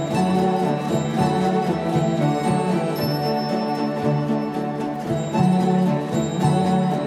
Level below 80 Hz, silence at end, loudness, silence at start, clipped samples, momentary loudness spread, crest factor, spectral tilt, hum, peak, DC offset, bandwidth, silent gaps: -54 dBFS; 0 s; -21 LUFS; 0 s; under 0.1%; 5 LU; 14 dB; -7 dB/octave; none; -6 dBFS; under 0.1%; 14 kHz; none